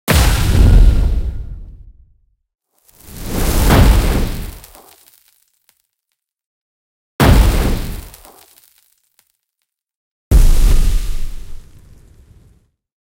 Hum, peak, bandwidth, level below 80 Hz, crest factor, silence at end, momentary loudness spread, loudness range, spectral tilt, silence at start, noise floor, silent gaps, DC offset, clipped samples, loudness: none; 0 dBFS; 17 kHz; -16 dBFS; 14 dB; 1.6 s; 22 LU; 3 LU; -5.5 dB/octave; 0.05 s; -76 dBFS; 6.46-7.19 s, 9.95-10.31 s; under 0.1%; under 0.1%; -15 LUFS